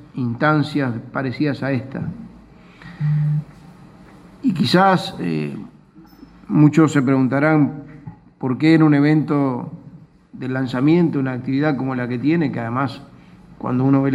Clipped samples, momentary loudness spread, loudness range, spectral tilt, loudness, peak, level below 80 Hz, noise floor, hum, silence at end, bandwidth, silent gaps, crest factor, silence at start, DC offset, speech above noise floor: under 0.1%; 15 LU; 7 LU; -7.5 dB/octave; -19 LUFS; -2 dBFS; -54 dBFS; -46 dBFS; none; 0 s; 11.5 kHz; none; 18 dB; 0 s; under 0.1%; 28 dB